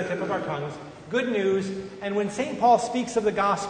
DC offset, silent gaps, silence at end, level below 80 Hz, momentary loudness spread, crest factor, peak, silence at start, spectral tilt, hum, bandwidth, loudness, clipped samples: under 0.1%; none; 0 s; -60 dBFS; 12 LU; 18 dB; -8 dBFS; 0 s; -5 dB/octave; none; 9.6 kHz; -25 LUFS; under 0.1%